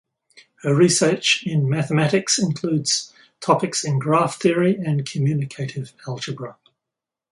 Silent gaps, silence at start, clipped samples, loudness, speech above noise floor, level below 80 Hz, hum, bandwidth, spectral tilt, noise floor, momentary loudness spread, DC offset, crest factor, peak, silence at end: none; 0.35 s; under 0.1%; -20 LUFS; 66 dB; -64 dBFS; none; 11.5 kHz; -4.5 dB/octave; -86 dBFS; 13 LU; under 0.1%; 18 dB; -2 dBFS; 0.8 s